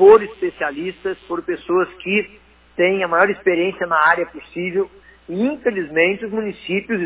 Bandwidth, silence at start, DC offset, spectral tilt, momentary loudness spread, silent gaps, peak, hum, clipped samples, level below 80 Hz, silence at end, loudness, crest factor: 4 kHz; 0 s; under 0.1%; -9 dB/octave; 11 LU; none; -2 dBFS; none; under 0.1%; -54 dBFS; 0 s; -19 LUFS; 16 dB